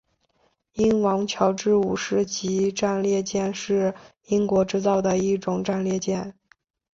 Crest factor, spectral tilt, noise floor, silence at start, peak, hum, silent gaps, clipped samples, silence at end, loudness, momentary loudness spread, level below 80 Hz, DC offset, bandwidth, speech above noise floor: 18 dB; -5.5 dB/octave; -67 dBFS; 0.75 s; -6 dBFS; none; none; under 0.1%; 0.6 s; -23 LUFS; 6 LU; -56 dBFS; under 0.1%; 7.8 kHz; 45 dB